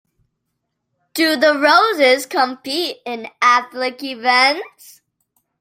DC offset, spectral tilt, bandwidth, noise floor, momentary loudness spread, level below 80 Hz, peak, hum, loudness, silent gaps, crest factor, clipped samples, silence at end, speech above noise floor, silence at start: under 0.1%; -1 dB/octave; 16.5 kHz; -75 dBFS; 14 LU; -70 dBFS; 0 dBFS; 60 Hz at -55 dBFS; -15 LUFS; none; 18 dB; under 0.1%; 0.95 s; 58 dB; 1.15 s